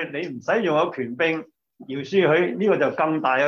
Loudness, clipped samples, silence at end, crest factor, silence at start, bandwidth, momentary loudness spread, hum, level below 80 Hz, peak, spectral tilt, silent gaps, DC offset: -22 LUFS; under 0.1%; 0 s; 16 dB; 0 s; 7 kHz; 10 LU; none; -70 dBFS; -6 dBFS; -6.5 dB/octave; none; under 0.1%